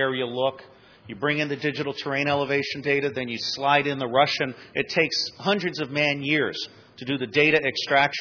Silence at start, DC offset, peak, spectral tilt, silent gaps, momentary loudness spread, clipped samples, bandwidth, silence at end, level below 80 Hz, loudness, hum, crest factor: 0 s; under 0.1%; -6 dBFS; -4.5 dB/octave; none; 8 LU; under 0.1%; 5.4 kHz; 0 s; -66 dBFS; -24 LUFS; none; 20 dB